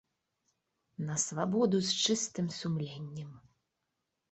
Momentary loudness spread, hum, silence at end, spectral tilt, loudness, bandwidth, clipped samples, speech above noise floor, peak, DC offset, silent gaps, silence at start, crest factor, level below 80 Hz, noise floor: 16 LU; none; 0.9 s; -4 dB/octave; -32 LUFS; 8.4 kHz; under 0.1%; 52 dB; -16 dBFS; under 0.1%; none; 1 s; 20 dB; -72 dBFS; -85 dBFS